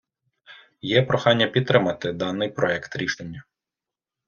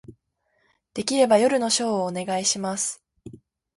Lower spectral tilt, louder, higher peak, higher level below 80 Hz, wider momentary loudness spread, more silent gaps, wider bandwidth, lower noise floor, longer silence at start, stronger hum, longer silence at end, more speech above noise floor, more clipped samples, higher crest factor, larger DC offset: first, -5.5 dB/octave vs -3 dB/octave; about the same, -22 LUFS vs -22 LUFS; first, -2 dBFS vs -6 dBFS; about the same, -60 dBFS vs -64 dBFS; about the same, 14 LU vs 12 LU; neither; second, 7 kHz vs 11.5 kHz; first, -89 dBFS vs -70 dBFS; first, 0.5 s vs 0.1 s; neither; first, 0.85 s vs 0.4 s; first, 66 dB vs 48 dB; neither; about the same, 22 dB vs 18 dB; neither